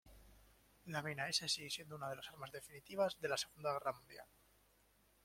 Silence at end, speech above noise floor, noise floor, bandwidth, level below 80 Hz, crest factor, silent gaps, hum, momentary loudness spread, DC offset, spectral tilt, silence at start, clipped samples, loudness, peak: 1 s; 30 dB; -74 dBFS; 16.5 kHz; -74 dBFS; 22 dB; none; none; 15 LU; under 0.1%; -2.5 dB/octave; 0.05 s; under 0.1%; -42 LUFS; -24 dBFS